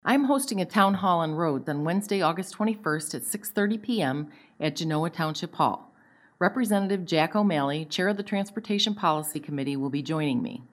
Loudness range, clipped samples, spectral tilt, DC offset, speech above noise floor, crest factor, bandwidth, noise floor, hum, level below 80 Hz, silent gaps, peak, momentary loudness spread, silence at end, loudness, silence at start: 3 LU; under 0.1%; -5 dB/octave; under 0.1%; 33 dB; 22 dB; 16 kHz; -59 dBFS; none; -74 dBFS; none; -6 dBFS; 7 LU; 0.05 s; -27 LUFS; 0.05 s